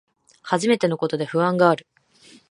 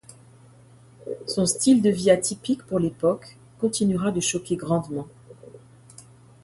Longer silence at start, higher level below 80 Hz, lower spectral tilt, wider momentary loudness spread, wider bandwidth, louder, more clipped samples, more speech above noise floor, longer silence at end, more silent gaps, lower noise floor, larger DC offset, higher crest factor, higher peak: second, 0.45 s vs 1 s; second, -70 dBFS vs -58 dBFS; about the same, -5.5 dB/octave vs -5 dB/octave; second, 8 LU vs 16 LU; about the same, 11.5 kHz vs 12 kHz; about the same, -21 LUFS vs -23 LUFS; neither; first, 32 dB vs 28 dB; about the same, 0.75 s vs 0.85 s; neither; about the same, -52 dBFS vs -51 dBFS; neither; about the same, 20 dB vs 20 dB; about the same, -2 dBFS vs -4 dBFS